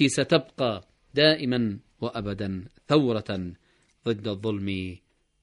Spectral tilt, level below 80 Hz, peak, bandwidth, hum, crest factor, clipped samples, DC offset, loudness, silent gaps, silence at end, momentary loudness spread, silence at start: -5 dB/octave; -58 dBFS; -6 dBFS; 10.5 kHz; none; 22 dB; under 0.1%; under 0.1%; -26 LUFS; none; 0.45 s; 13 LU; 0 s